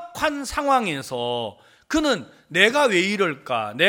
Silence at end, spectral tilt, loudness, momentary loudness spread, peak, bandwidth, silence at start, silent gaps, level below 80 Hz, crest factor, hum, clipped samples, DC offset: 0 s; -3.5 dB/octave; -22 LUFS; 10 LU; 0 dBFS; 17 kHz; 0 s; none; -52 dBFS; 22 dB; none; under 0.1%; under 0.1%